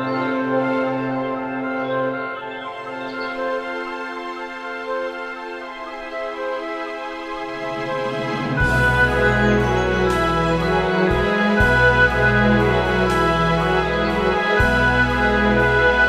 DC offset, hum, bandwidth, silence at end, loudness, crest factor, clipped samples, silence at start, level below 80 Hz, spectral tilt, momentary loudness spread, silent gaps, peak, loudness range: under 0.1%; none; 14.5 kHz; 0 s; -19 LUFS; 16 dB; under 0.1%; 0 s; -32 dBFS; -6 dB/octave; 13 LU; none; -2 dBFS; 11 LU